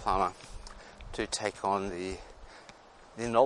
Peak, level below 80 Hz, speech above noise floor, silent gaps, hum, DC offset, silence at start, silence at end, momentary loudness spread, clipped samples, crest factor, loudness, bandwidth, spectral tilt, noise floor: -10 dBFS; -50 dBFS; 24 dB; none; none; under 0.1%; 0 s; 0 s; 21 LU; under 0.1%; 22 dB; -34 LUFS; 11.5 kHz; -4 dB/octave; -54 dBFS